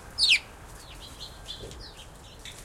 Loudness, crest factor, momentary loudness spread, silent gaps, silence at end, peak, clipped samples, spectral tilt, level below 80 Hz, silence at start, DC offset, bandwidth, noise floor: -22 LUFS; 22 dB; 25 LU; none; 0 s; -10 dBFS; under 0.1%; -0.5 dB/octave; -50 dBFS; 0 s; under 0.1%; 16.5 kHz; -47 dBFS